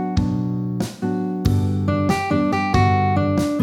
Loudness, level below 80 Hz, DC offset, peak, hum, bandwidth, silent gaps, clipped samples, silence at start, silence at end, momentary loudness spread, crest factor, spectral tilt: -20 LUFS; -36 dBFS; under 0.1%; -4 dBFS; none; 14 kHz; none; under 0.1%; 0 s; 0 s; 7 LU; 16 dB; -7 dB/octave